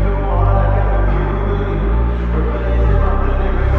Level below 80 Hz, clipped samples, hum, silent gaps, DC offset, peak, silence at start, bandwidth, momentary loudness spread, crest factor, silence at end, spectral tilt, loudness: -16 dBFS; under 0.1%; none; none; under 0.1%; -2 dBFS; 0 s; 4 kHz; 3 LU; 12 dB; 0 s; -10 dB/octave; -17 LUFS